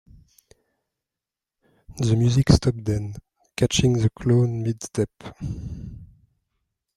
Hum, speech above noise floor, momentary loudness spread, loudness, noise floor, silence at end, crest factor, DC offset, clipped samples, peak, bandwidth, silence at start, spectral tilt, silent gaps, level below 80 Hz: none; 67 dB; 17 LU; -22 LUFS; -88 dBFS; 0.9 s; 22 dB; under 0.1%; under 0.1%; -2 dBFS; 12.5 kHz; 1.9 s; -6 dB/octave; none; -40 dBFS